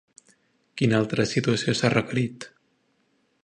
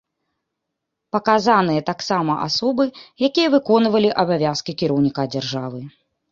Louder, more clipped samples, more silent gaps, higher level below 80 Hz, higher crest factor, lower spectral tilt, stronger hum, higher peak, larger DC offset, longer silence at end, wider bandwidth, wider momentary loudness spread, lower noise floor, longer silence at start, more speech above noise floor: second, -24 LUFS vs -19 LUFS; neither; neither; about the same, -60 dBFS vs -60 dBFS; about the same, 22 dB vs 18 dB; about the same, -5.5 dB/octave vs -5.5 dB/octave; neither; about the same, -4 dBFS vs -2 dBFS; neither; first, 0.95 s vs 0.4 s; first, 10 kHz vs 7.6 kHz; first, 20 LU vs 9 LU; second, -69 dBFS vs -79 dBFS; second, 0.75 s vs 1.15 s; second, 45 dB vs 61 dB